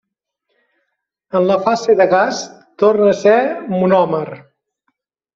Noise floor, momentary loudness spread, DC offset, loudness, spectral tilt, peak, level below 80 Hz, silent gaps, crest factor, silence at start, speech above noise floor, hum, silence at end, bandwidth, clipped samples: -73 dBFS; 10 LU; under 0.1%; -14 LUFS; -5.5 dB/octave; -2 dBFS; -62 dBFS; none; 14 dB; 1.35 s; 59 dB; none; 1 s; 7.6 kHz; under 0.1%